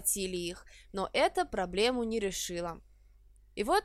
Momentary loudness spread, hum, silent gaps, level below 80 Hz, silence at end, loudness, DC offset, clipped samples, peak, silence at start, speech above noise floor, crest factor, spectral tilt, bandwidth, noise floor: 14 LU; 50 Hz at -55 dBFS; none; -54 dBFS; 0 s; -33 LUFS; under 0.1%; under 0.1%; -14 dBFS; 0 s; 27 dB; 18 dB; -3 dB/octave; 16 kHz; -59 dBFS